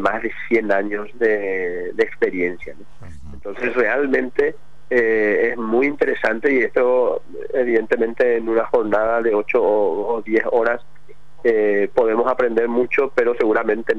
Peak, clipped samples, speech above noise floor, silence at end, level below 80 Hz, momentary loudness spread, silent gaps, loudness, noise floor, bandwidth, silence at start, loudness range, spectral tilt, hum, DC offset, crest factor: -6 dBFS; under 0.1%; 31 dB; 0 s; -52 dBFS; 7 LU; none; -19 LUFS; -50 dBFS; 7 kHz; 0 s; 3 LU; -7 dB/octave; none; 3%; 14 dB